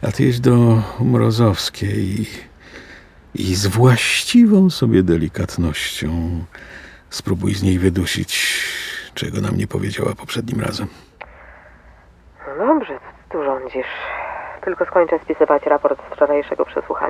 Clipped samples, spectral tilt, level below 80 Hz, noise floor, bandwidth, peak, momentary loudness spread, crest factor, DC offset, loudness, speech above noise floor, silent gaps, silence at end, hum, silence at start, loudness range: under 0.1%; -5.5 dB/octave; -36 dBFS; -47 dBFS; 16 kHz; 0 dBFS; 16 LU; 18 dB; under 0.1%; -18 LUFS; 30 dB; none; 0 s; none; 0 s; 9 LU